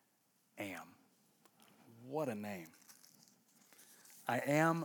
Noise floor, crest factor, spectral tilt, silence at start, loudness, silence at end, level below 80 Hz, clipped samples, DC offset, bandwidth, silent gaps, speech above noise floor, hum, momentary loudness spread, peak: -77 dBFS; 24 dB; -5.5 dB/octave; 0.55 s; -40 LUFS; 0 s; under -90 dBFS; under 0.1%; under 0.1%; over 20 kHz; none; 40 dB; none; 27 LU; -20 dBFS